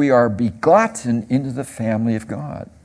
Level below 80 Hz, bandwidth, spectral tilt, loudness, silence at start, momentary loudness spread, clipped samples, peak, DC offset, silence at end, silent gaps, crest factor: -52 dBFS; 11 kHz; -7 dB/octave; -19 LUFS; 0 s; 13 LU; under 0.1%; 0 dBFS; under 0.1%; 0.2 s; none; 18 dB